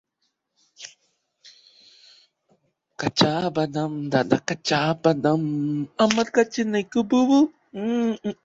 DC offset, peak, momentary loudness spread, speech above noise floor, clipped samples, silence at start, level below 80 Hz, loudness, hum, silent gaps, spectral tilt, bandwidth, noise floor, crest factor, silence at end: under 0.1%; -2 dBFS; 9 LU; 53 dB; under 0.1%; 0.8 s; -64 dBFS; -22 LUFS; none; none; -5.5 dB/octave; 8 kHz; -75 dBFS; 22 dB; 0.1 s